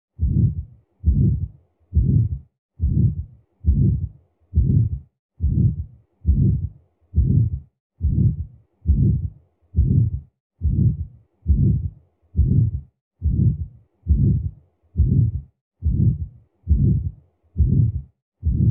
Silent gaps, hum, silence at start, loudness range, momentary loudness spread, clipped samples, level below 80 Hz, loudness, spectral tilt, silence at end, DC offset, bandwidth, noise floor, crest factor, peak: 2.59-2.69 s, 5.19-5.29 s, 7.80-7.90 s, 10.40-10.50 s, 13.01-13.11 s, 15.61-15.71 s, 18.22-18.32 s; none; 0.2 s; 1 LU; 15 LU; under 0.1%; -26 dBFS; -22 LUFS; -20.5 dB/octave; 0 s; under 0.1%; 0.7 kHz; -42 dBFS; 14 dB; -6 dBFS